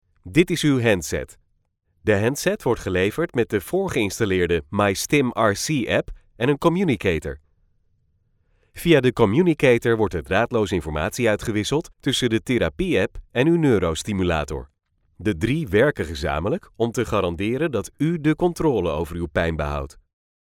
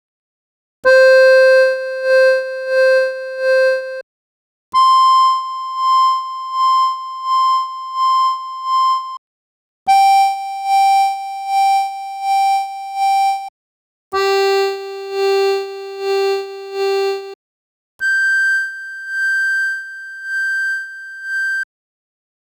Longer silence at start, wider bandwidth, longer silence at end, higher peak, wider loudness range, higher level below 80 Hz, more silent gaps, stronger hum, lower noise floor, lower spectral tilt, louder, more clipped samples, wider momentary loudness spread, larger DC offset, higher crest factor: second, 0.25 s vs 0.85 s; about the same, 17.5 kHz vs 18.5 kHz; second, 0.55 s vs 0.95 s; second, -4 dBFS vs 0 dBFS; second, 3 LU vs 6 LU; first, -42 dBFS vs -66 dBFS; second, none vs 4.03-4.72 s, 9.18-9.86 s, 13.49-14.11 s, 17.35-17.99 s; neither; second, -68 dBFS vs under -90 dBFS; first, -5.5 dB/octave vs -0.5 dB/octave; second, -22 LUFS vs -15 LUFS; neither; second, 9 LU vs 14 LU; neither; about the same, 18 dB vs 16 dB